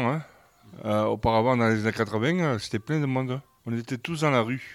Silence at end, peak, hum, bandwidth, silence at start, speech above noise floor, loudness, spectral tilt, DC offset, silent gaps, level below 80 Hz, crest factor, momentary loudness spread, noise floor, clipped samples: 0 s; -10 dBFS; none; 15 kHz; 0 s; 23 dB; -26 LUFS; -6.5 dB/octave; under 0.1%; none; -52 dBFS; 16 dB; 11 LU; -48 dBFS; under 0.1%